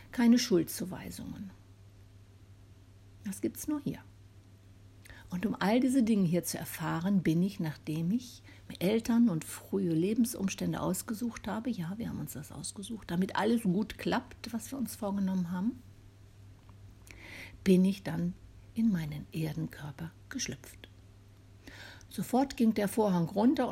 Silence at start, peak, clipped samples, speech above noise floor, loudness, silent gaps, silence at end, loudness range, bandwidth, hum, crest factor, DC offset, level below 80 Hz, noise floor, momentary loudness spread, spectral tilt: 0 s; -14 dBFS; under 0.1%; 25 dB; -32 LUFS; none; 0 s; 10 LU; 16 kHz; none; 20 dB; under 0.1%; -60 dBFS; -56 dBFS; 19 LU; -6 dB/octave